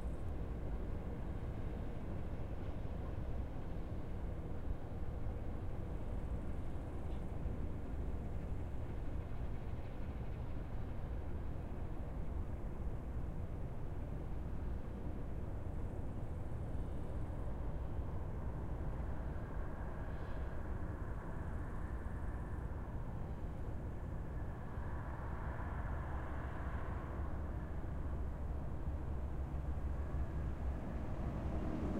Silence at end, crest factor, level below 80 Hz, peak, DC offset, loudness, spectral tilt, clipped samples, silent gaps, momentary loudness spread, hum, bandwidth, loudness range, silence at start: 0 s; 14 dB; -44 dBFS; -28 dBFS; under 0.1%; -45 LUFS; -9 dB/octave; under 0.1%; none; 3 LU; none; 4.7 kHz; 2 LU; 0 s